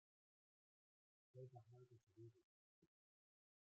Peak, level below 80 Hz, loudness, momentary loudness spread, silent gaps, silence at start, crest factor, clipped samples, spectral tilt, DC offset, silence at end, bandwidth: -50 dBFS; under -90 dBFS; -66 LUFS; 6 LU; 2.03-2.07 s, 2.44-2.82 s; 1.35 s; 20 dB; under 0.1%; -9.5 dB/octave; under 0.1%; 0.85 s; 6.6 kHz